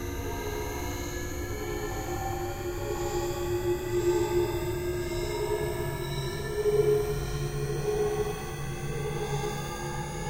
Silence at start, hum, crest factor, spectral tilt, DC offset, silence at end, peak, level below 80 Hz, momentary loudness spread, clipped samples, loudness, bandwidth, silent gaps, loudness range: 0 s; none; 16 dB; -5.5 dB/octave; under 0.1%; 0 s; -14 dBFS; -40 dBFS; 8 LU; under 0.1%; -31 LUFS; 16 kHz; none; 3 LU